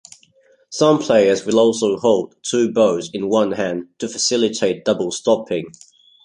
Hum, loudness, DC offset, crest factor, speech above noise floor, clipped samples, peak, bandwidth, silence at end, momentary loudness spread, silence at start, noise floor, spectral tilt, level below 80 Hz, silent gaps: none; -18 LUFS; under 0.1%; 16 dB; 38 dB; under 0.1%; -2 dBFS; 11 kHz; 0.55 s; 11 LU; 0.7 s; -55 dBFS; -4 dB/octave; -60 dBFS; none